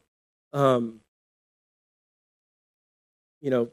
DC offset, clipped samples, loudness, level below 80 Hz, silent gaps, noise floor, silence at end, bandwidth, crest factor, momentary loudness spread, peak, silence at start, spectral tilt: under 0.1%; under 0.1%; -26 LUFS; -78 dBFS; 1.08-3.41 s; under -90 dBFS; 0.05 s; 14.5 kHz; 22 dB; 13 LU; -8 dBFS; 0.55 s; -7.5 dB/octave